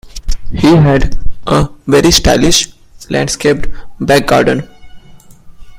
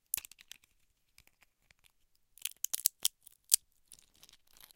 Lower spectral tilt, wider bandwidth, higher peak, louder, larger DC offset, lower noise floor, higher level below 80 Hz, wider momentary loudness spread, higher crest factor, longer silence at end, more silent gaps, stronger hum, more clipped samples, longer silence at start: first, -4.5 dB/octave vs 3.5 dB/octave; about the same, 16.5 kHz vs 17 kHz; about the same, 0 dBFS vs -2 dBFS; first, -11 LUFS vs -33 LUFS; neither; second, -36 dBFS vs -74 dBFS; first, -22 dBFS vs -76 dBFS; second, 15 LU vs 24 LU; second, 10 dB vs 40 dB; second, 0 s vs 1.2 s; neither; neither; first, 0.1% vs under 0.1%; about the same, 0.05 s vs 0.15 s